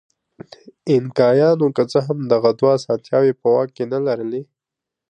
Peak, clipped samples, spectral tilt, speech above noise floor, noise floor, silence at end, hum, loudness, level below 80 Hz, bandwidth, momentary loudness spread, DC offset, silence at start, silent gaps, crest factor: -2 dBFS; under 0.1%; -7.5 dB/octave; 67 dB; -85 dBFS; 0.65 s; none; -18 LUFS; -66 dBFS; 9.4 kHz; 8 LU; under 0.1%; 0.65 s; none; 16 dB